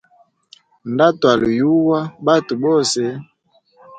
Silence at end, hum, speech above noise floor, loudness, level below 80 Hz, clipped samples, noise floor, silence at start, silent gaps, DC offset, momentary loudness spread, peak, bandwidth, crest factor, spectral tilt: 0 s; none; 42 dB; -16 LUFS; -56 dBFS; under 0.1%; -58 dBFS; 0.85 s; none; under 0.1%; 11 LU; 0 dBFS; 9.4 kHz; 18 dB; -5 dB/octave